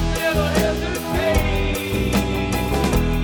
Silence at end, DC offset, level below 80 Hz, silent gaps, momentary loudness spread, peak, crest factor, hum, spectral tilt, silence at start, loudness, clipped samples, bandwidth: 0 s; under 0.1%; -26 dBFS; none; 3 LU; -4 dBFS; 14 dB; none; -5.5 dB/octave; 0 s; -20 LUFS; under 0.1%; 19 kHz